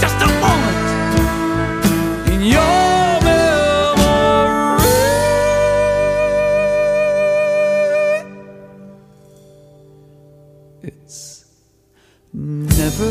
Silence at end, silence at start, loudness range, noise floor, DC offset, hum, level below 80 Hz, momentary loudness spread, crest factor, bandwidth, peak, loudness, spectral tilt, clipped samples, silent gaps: 0 s; 0 s; 11 LU; -55 dBFS; under 0.1%; none; -28 dBFS; 17 LU; 16 dB; 15.5 kHz; 0 dBFS; -15 LUFS; -5 dB/octave; under 0.1%; none